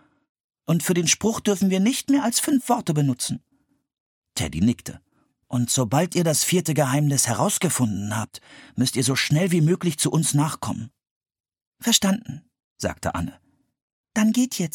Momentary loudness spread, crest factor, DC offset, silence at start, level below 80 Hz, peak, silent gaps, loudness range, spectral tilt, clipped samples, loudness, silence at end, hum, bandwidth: 12 LU; 20 dB; under 0.1%; 0.7 s; -54 dBFS; -4 dBFS; 4.00-4.22 s, 11.11-11.21 s, 11.40-11.44 s, 11.67-11.72 s, 12.64-12.76 s, 13.82-14.04 s; 4 LU; -4.5 dB/octave; under 0.1%; -22 LUFS; 0.05 s; none; 17.5 kHz